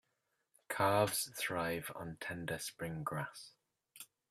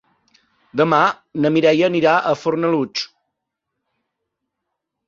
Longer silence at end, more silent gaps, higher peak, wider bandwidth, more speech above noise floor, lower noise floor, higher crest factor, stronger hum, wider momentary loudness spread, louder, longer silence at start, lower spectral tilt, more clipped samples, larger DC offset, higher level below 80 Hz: second, 0.25 s vs 2 s; neither; second, -18 dBFS vs -2 dBFS; first, 16 kHz vs 7.4 kHz; second, 45 dB vs 62 dB; first, -84 dBFS vs -79 dBFS; about the same, 22 dB vs 18 dB; neither; first, 22 LU vs 10 LU; second, -38 LUFS vs -17 LUFS; about the same, 0.7 s vs 0.75 s; second, -4 dB/octave vs -6 dB/octave; neither; neither; second, -72 dBFS vs -64 dBFS